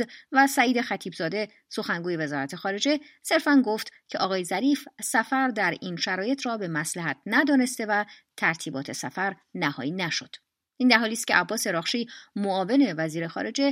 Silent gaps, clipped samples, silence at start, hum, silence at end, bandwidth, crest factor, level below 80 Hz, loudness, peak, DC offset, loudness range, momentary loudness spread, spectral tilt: none; under 0.1%; 0 s; none; 0 s; 16 kHz; 22 dB; -78 dBFS; -26 LUFS; -4 dBFS; under 0.1%; 2 LU; 10 LU; -3.5 dB/octave